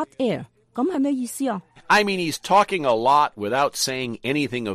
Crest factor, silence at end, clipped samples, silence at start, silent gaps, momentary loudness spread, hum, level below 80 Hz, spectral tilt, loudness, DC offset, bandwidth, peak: 16 dB; 0 s; under 0.1%; 0 s; none; 9 LU; none; -60 dBFS; -4 dB/octave; -22 LUFS; under 0.1%; 15 kHz; -6 dBFS